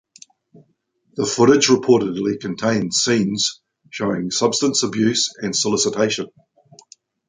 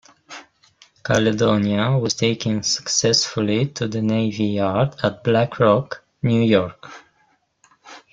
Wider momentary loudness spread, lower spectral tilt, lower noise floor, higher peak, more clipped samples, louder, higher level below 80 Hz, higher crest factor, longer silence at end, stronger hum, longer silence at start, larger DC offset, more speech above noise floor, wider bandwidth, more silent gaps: second, 10 LU vs 15 LU; about the same, -3.5 dB/octave vs -4.5 dB/octave; about the same, -66 dBFS vs -63 dBFS; about the same, -2 dBFS vs -2 dBFS; neither; about the same, -18 LUFS vs -19 LUFS; second, -60 dBFS vs -54 dBFS; about the same, 18 dB vs 18 dB; first, 1 s vs 0.15 s; neither; first, 1.15 s vs 0.3 s; neither; about the same, 47 dB vs 44 dB; about the same, 9.6 kHz vs 9.2 kHz; neither